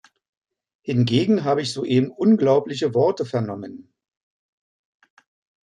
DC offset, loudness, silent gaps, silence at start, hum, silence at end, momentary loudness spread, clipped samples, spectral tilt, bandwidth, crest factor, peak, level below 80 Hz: under 0.1%; -20 LUFS; none; 0.85 s; none; 1.85 s; 12 LU; under 0.1%; -7 dB/octave; 11 kHz; 18 dB; -6 dBFS; -66 dBFS